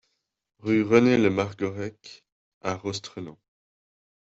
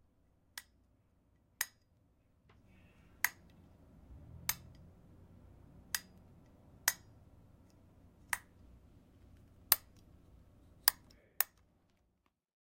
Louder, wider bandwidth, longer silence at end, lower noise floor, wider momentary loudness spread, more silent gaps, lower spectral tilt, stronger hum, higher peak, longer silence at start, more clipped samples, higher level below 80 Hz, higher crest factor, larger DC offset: first, -25 LUFS vs -36 LUFS; second, 8 kHz vs 16.5 kHz; second, 1 s vs 1.2 s; second, -76 dBFS vs -80 dBFS; second, 18 LU vs 22 LU; first, 2.32-2.61 s vs none; first, -6 dB/octave vs 0 dB/octave; neither; about the same, -4 dBFS vs -4 dBFS; about the same, 0.65 s vs 0.55 s; neither; about the same, -64 dBFS vs -68 dBFS; second, 22 dB vs 40 dB; neither